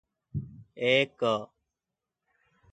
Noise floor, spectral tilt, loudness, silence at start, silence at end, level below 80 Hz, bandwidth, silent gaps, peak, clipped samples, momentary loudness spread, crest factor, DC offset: -88 dBFS; -5.5 dB/octave; -28 LUFS; 0.35 s; 1.25 s; -60 dBFS; 9.2 kHz; none; -8 dBFS; under 0.1%; 19 LU; 24 dB; under 0.1%